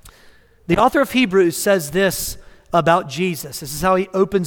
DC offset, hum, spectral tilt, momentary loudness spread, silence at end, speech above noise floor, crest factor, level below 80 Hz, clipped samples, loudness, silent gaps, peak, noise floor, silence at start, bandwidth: under 0.1%; none; -4.5 dB/octave; 10 LU; 0 s; 31 dB; 18 dB; -44 dBFS; under 0.1%; -18 LUFS; none; 0 dBFS; -49 dBFS; 0.05 s; 18.5 kHz